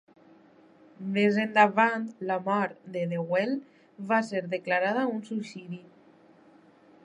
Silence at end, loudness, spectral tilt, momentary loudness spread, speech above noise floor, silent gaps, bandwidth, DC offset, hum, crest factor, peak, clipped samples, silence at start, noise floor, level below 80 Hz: 1.25 s; -27 LUFS; -6.5 dB/octave; 17 LU; 30 dB; none; 10.5 kHz; under 0.1%; none; 24 dB; -6 dBFS; under 0.1%; 1 s; -57 dBFS; -82 dBFS